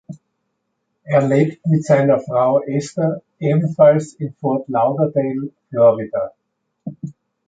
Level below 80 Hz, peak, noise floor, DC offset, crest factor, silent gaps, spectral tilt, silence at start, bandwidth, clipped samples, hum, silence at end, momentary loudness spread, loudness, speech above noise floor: -62 dBFS; -2 dBFS; -73 dBFS; under 0.1%; 16 dB; none; -8 dB/octave; 0.1 s; 9.2 kHz; under 0.1%; none; 0.35 s; 16 LU; -17 LUFS; 56 dB